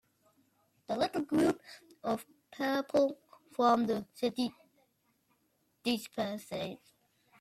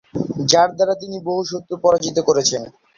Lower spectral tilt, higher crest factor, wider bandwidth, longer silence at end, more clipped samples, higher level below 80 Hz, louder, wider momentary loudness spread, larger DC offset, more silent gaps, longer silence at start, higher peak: first, -5 dB/octave vs -3.5 dB/octave; about the same, 22 dB vs 18 dB; first, 15.5 kHz vs 7.6 kHz; first, 0.65 s vs 0.3 s; neither; second, -72 dBFS vs -56 dBFS; second, -33 LUFS vs -18 LUFS; first, 14 LU vs 10 LU; neither; neither; first, 0.9 s vs 0.15 s; second, -14 dBFS vs 0 dBFS